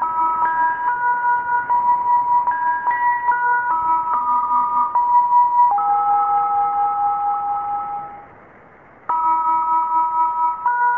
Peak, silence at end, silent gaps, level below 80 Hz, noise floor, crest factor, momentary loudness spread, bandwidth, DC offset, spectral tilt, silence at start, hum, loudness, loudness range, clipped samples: -6 dBFS; 0 s; none; -58 dBFS; -46 dBFS; 12 dB; 6 LU; 3.1 kHz; 0.1%; -6.5 dB/octave; 0 s; none; -18 LUFS; 5 LU; under 0.1%